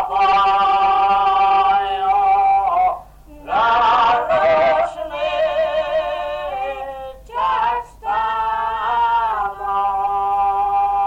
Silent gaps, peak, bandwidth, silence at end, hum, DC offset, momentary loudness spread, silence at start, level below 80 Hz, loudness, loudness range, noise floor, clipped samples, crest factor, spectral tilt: none; -8 dBFS; 8 kHz; 0 s; none; under 0.1%; 10 LU; 0 s; -44 dBFS; -17 LUFS; 5 LU; -40 dBFS; under 0.1%; 10 dB; -4 dB/octave